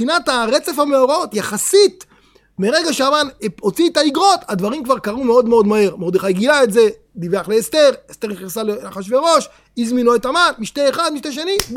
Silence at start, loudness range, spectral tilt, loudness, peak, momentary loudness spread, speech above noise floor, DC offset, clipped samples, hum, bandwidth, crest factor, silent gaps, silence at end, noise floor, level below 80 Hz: 0 s; 2 LU; -3.5 dB/octave; -16 LUFS; 0 dBFS; 10 LU; 36 dB; under 0.1%; under 0.1%; none; 17.5 kHz; 16 dB; none; 0 s; -52 dBFS; -50 dBFS